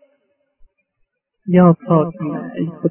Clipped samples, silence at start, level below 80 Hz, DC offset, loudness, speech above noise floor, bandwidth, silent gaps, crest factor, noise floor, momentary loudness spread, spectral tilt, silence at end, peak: under 0.1%; 1.45 s; -58 dBFS; under 0.1%; -16 LUFS; 53 dB; 3.2 kHz; none; 18 dB; -68 dBFS; 13 LU; -13 dB/octave; 0 s; 0 dBFS